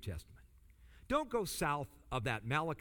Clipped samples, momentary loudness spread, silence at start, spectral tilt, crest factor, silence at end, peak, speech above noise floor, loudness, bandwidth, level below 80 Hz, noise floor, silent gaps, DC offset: under 0.1%; 7 LU; 0 s; -5 dB/octave; 20 dB; 0 s; -20 dBFS; 24 dB; -38 LUFS; over 20 kHz; -56 dBFS; -62 dBFS; none; under 0.1%